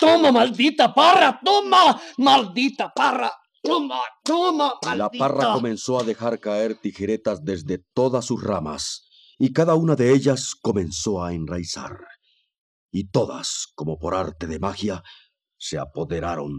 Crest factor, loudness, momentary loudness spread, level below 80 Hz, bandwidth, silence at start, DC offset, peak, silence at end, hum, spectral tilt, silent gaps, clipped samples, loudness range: 18 dB; -21 LUFS; 14 LU; -52 dBFS; 13 kHz; 0 s; under 0.1%; -4 dBFS; 0 s; none; -4.5 dB/octave; 12.58-12.89 s; under 0.1%; 10 LU